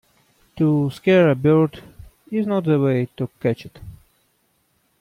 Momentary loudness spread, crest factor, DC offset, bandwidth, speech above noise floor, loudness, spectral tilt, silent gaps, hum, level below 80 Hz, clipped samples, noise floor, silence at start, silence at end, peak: 12 LU; 16 dB; under 0.1%; 14 kHz; 47 dB; -20 LUFS; -8.5 dB/octave; none; none; -54 dBFS; under 0.1%; -66 dBFS; 0.55 s; 1.05 s; -6 dBFS